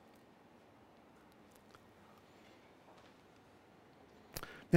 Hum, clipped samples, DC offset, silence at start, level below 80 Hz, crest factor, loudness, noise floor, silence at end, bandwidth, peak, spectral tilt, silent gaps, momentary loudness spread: none; under 0.1%; under 0.1%; 4.35 s; -72 dBFS; 32 dB; -58 LUFS; -63 dBFS; 0 s; 16 kHz; -12 dBFS; -6.5 dB/octave; none; 14 LU